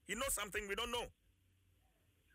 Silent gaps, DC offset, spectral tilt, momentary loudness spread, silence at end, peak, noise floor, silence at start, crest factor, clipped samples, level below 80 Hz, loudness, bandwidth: none; under 0.1%; -1.5 dB/octave; 6 LU; 1.25 s; -28 dBFS; -75 dBFS; 0.1 s; 16 dB; under 0.1%; -60 dBFS; -41 LUFS; 16 kHz